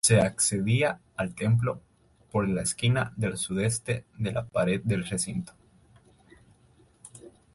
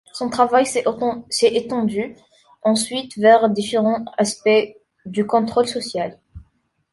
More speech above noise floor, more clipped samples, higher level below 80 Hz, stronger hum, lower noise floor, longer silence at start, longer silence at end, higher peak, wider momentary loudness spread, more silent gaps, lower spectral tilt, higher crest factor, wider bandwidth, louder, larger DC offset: second, 34 dB vs 44 dB; neither; about the same, -54 dBFS vs -56 dBFS; neither; about the same, -61 dBFS vs -62 dBFS; about the same, 0.05 s vs 0.15 s; second, 0.25 s vs 0.55 s; second, -8 dBFS vs -2 dBFS; about the same, 11 LU vs 11 LU; neither; about the same, -4.5 dB/octave vs -4 dB/octave; about the same, 20 dB vs 18 dB; about the same, 12 kHz vs 11.5 kHz; second, -28 LUFS vs -19 LUFS; neither